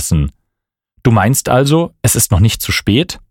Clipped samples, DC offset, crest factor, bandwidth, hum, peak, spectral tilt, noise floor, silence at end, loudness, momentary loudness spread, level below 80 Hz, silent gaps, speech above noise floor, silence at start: under 0.1%; under 0.1%; 14 dB; 17 kHz; none; 0 dBFS; -4.5 dB/octave; -77 dBFS; 0.15 s; -13 LUFS; 6 LU; -28 dBFS; none; 65 dB; 0 s